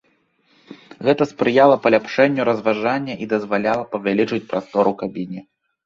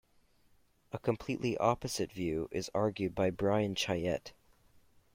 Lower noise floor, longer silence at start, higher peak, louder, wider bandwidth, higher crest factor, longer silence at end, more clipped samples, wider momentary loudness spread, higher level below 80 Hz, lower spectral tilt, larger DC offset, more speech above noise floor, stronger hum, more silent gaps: second, -62 dBFS vs -68 dBFS; second, 0.7 s vs 0.95 s; first, -2 dBFS vs -12 dBFS; first, -19 LUFS vs -34 LUFS; second, 7.4 kHz vs 16.5 kHz; about the same, 18 dB vs 22 dB; second, 0.45 s vs 0.85 s; neither; first, 12 LU vs 6 LU; about the same, -60 dBFS vs -60 dBFS; first, -7 dB/octave vs -5.5 dB/octave; neither; first, 44 dB vs 34 dB; neither; neither